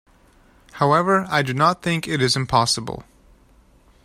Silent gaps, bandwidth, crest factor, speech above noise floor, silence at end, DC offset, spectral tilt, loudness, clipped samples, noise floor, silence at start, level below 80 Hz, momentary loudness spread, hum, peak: none; 15.5 kHz; 20 dB; 34 dB; 1.05 s; under 0.1%; -4.5 dB/octave; -19 LUFS; under 0.1%; -54 dBFS; 0.75 s; -50 dBFS; 6 LU; none; -2 dBFS